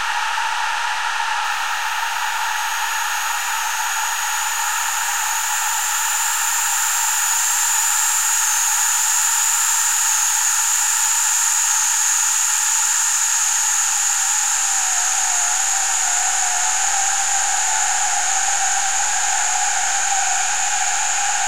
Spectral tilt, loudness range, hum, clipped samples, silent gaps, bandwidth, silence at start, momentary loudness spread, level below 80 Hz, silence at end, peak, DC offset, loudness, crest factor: 4.5 dB/octave; 5 LU; none; under 0.1%; none; 16 kHz; 0 s; 6 LU; -70 dBFS; 0 s; -4 dBFS; 2%; -16 LUFS; 14 dB